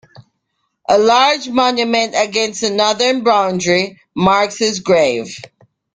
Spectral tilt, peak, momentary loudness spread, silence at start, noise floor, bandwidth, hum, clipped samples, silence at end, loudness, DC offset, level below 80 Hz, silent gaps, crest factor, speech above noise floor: -3.5 dB/octave; 0 dBFS; 7 LU; 0.9 s; -70 dBFS; 9.6 kHz; none; under 0.1%; 0.5 s; -14 LUFS; under 0.1%; -54 dBFS; none; 14 dB; 55 dB